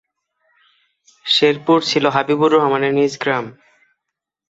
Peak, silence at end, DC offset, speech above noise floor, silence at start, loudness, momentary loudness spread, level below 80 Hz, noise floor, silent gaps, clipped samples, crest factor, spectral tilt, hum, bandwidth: -2 dBFS; 1 s; under 0.1%; 66 dB; 1.25 s; -16 LUFS; 8 LU; -64 dBFS; -81 dBFS; none; under 0.1%; 16 dB; -4.5 dB/octave; none; 8 kHz